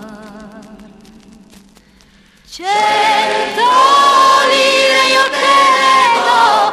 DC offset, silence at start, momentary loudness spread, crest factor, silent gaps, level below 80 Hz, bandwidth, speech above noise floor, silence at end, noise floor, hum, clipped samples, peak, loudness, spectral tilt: under 0.1%; 0 s; 6 LU; 12 dB; none; -52 dBFS; 13.5 kHz; 33 dB; 0 s; -46 dBFS; none; under 0.1%; 0 dBFS; -10 LUFS; -1 dB/octave